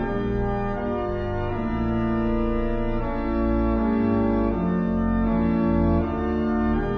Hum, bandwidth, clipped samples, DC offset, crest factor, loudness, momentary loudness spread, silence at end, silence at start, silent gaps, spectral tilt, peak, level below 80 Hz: none; 5.8 kHz; under 0.1%; under 0.1%; 14 dB; -24 LUFS; 5 LU; 0 s; 0 s; none; -10 dB/octave; -10 dBFS; -30 dBFS